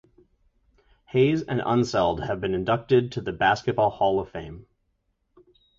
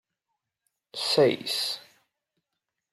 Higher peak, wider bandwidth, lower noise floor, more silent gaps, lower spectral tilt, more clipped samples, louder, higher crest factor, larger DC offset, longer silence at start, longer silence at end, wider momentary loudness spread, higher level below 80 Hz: about the same, -8 dBFS vs -10 dBFS; second, 7.6 kHz vs 15.5 kHz; second, -73 dBFS vs -85 dBFS; neither; first, -6.5 dB/octave vs -3.5 dB/octave; neither; about the same, -24 LUFS vs -25 LUFS; about the same, 18 dB vs 20 dB; neither; first, 1.15 s vs 0.95 s; about the same, 1.15 s vs 1.1 s; second, 8 LU vs 15 LU; first, -50 dBFS vs -76 dBFS